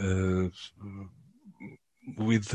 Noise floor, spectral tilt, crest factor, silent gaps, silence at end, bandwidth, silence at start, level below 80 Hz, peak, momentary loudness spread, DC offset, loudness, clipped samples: -56 dBFS; -6.5 dB/octave; 20 dB; none; 0 s; 10 kHz; 0 s; -46 dBFS; -12 dBFS; 21 LU; under 0.1%; -30 LUFS; under 0.1%